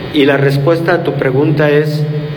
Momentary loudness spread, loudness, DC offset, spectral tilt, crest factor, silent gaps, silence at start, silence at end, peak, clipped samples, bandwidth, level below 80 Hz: 4 LU; -12 LUFS; under 0.1%; -7.5 dB/octave; 12 dB; none; 0 s; 0 s; 0 dBFS; under 0.1%; 19 kHz; -46 dBFS